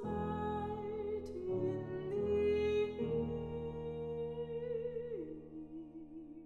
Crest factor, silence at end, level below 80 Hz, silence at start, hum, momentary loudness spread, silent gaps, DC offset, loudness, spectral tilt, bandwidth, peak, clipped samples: 14 dB; 0 s; -60 dBFS; 0 s; none; 15 LU; none; under 0.1%; -39 LUFS; -8.5 dB/octave; 7 kHz; -24 dBFS; under 0.1%